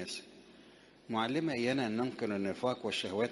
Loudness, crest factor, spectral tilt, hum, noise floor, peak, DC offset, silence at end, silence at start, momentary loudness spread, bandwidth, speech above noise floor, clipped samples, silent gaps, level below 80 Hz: -35 LUFS; 18 dB; -5 dB/octave; none; -59 dBFS; -18 dBFS; under 0.1%; 0 s; 0 s; 8 LU; 11.5 kHz; 25 dB; under 0.1%; none; -74 dBFS